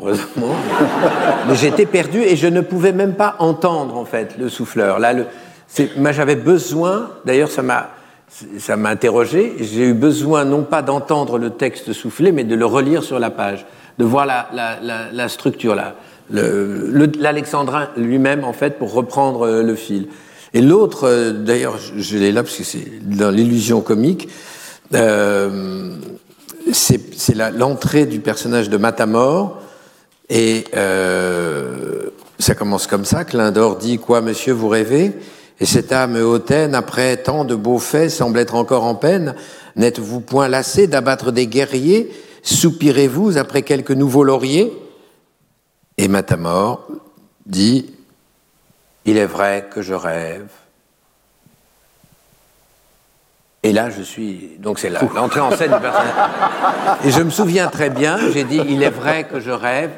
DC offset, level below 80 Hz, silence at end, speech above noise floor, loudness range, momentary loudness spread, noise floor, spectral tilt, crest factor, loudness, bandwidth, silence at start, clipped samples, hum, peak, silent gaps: under 0.1%; -52 dBFS; 0 s; 46 dB; 5 LU; 11 LU; -61 dBFS; -5 dB/octave; 16 dB; -16 LUFS; 17 kHz; 0 s; under 0.1%; none; 0 dBFS; none